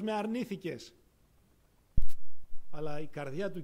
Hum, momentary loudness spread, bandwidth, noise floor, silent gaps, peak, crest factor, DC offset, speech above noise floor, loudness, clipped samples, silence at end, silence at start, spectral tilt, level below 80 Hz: none; 13 LU; 7.4 kHz; -66 dBFS; none; -12 dBFS; 14 dB; under 0.1%; 32 dB; -39 LUFS; under 0.1%; 0 s; 0 s; -6.5 dB/octave; -42 dBFS